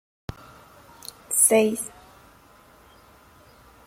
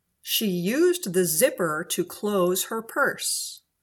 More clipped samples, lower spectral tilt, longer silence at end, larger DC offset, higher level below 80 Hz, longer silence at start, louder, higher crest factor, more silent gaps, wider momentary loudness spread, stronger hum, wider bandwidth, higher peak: neither; about the same, -2.5 dB/octave vs -3.5 dB/octave; first, 2 s vs 0.25 s; neither; first, -56 dBFS vs -70 dBFS; first, 1.3 s vs 0.25 s; first, -20 LUFS vs -24 LUFS; first, 24 dB vs 18 dB; neither; first, 25 LU vs 6 LU; neither; second, 16.5 kHz vs 19 kHz; first, -4 dBFS vs -8 dBFS